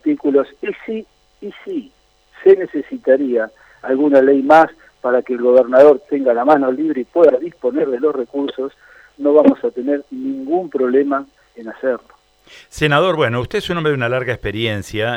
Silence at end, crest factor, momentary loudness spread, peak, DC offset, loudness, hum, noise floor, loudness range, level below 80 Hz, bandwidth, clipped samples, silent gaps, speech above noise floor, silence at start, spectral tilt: 0 s; 16 dB; 16 LU; 0 dBFS; under 0.1%; -16 LUFS; none; -46 dBFS; 6 LU; -48 dBFS; 13 kHz; under 0.1%; none; 31 dB; 0.05 s; -6.5 dB/octave